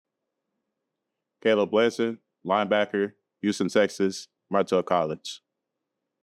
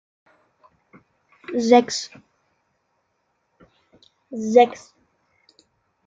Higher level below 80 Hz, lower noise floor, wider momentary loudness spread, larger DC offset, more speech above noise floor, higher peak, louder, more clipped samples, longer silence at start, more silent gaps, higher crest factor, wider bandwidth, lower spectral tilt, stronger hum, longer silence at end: second, -78 dBFS vs -72 dBFS; first, -84 dBFS vs -71 dBFS; second, 12 LU vs 22 LU; neither; first, 59 dB vs 53 dB; second, -8 dBFS vs -2 dBFS; second, -26 LUFS vs -19 LUFS; neither; about the same, 1.45 s vs 1.5 s; neither; about the same, 20 dB vs 24 dB; first, 13 kHz vs 8.8 kHz; about the same, -5 dB/octave vs -4 dB/octave; neither; second, 0.85 s vs 1.3 s